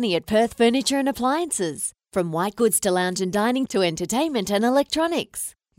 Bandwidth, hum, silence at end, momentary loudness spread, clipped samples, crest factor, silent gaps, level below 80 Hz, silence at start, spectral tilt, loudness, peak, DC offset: 16 kHz; none; 0.3 s; 7 LU; under 0.1%; 16 dB; none; -56 dBFS; 0 s; -3.5 dB/octave; -22 LUFS; -6 dBFS; under 0.1%